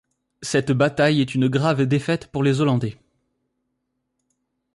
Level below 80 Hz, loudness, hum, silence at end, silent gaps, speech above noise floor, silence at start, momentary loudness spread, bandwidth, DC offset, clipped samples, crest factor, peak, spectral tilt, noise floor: -56 dBFS; -20 LUFS; none; 1.8 s; none; 56 dB; 0.4 s; 6 LU; 11.5 kHz; under 0.1%; under 0.1%; 16 dB; -8 dBFS; -6.5 dB/octave; -76 dBFS